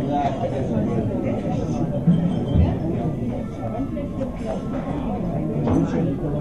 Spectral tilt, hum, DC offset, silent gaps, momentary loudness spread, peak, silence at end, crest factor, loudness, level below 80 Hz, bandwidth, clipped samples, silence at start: -9 dB/octave; none; 0.7%; none; 7 LU; -6 dBFS; 0 s; 16 dB; -23 LUFS; -34 dBFS; 9 kHz; under 0.1%; 0 s